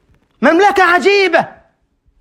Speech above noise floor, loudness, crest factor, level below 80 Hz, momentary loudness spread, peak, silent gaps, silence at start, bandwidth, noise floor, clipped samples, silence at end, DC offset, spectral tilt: 48 dB; -11 LUFS; 14 dB; -54 dBFS; 6 LU; 0 dBFS; none; 0.4 s; 16 kHz; -58 dBFS; under 0.1%; 0.7 s; under 0.1%; -3.5 dB/octave